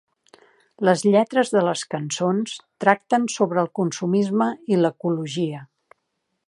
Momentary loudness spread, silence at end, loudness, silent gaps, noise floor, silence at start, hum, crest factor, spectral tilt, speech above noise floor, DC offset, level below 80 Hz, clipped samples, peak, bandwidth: 9 LU; 0.85 s; -22 LUFS; none; -76 dBFS; 0.8 s; none; 22 dB; -5.5 dB/octave; 55 dB; under 0.1%; -74 dBFS; under 0.1%; 0 dBFS; 11.5 kHz